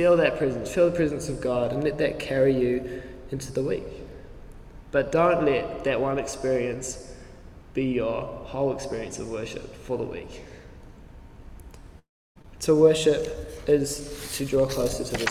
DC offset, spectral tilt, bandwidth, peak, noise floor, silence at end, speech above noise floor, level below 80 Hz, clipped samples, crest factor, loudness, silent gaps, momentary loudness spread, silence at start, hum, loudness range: under 0.1%; -5 dB/octave; 16 kHz; -6 dBFS; -45 dBFS; 0 s; 21 dB; -46 dBFS; under 0.1%; 20 dB; -26 LUFS; 12.09-12.35 s; 17 LU; 0 s; none; 9 LU